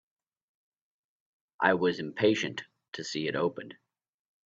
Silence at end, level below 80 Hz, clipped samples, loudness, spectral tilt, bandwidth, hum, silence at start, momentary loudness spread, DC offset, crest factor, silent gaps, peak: 0.75 s; -74 dBFS; under 0.1%; -29 LUFS; -5 dB/octave; 7.8 kHz; none; 1.6 s; 18 LU; under 0.1%; 26 dB; 2.88-2.92 s; -8 dBFS